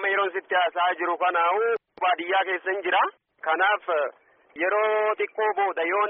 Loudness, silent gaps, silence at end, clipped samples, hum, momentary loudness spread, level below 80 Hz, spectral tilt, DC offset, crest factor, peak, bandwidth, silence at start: -24 LUFS; none; 0 s; under 0.1%; none; 5 LU; -82 dBFS; 6.5 dB/octave; under 0.1%; 14 dB; -12 dBFS; 3.8 kHz; 0 s